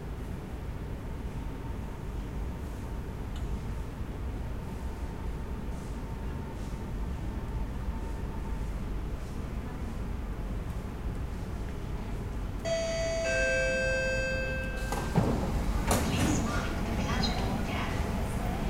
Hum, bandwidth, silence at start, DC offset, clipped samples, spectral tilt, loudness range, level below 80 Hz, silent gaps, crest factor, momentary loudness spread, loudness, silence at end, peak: none; 16 kHz; 0 s; 0.2%; under 0.1%; -5.5 dB/octave; 9 LU; -36 dBFS; none; 20 dB; 11 LU; -34 LUFS; 0 s; -14 dBFS